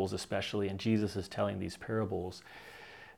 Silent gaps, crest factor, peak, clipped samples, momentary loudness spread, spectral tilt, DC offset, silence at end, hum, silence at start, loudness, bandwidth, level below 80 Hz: none; 18 dB; -18 dBFS; under 0.1%; 18 LU; -6 dB/octave; under 0.1%; 0.05 s; none; 0 s; -35 LUFS; 15 kHz; -66 dBFS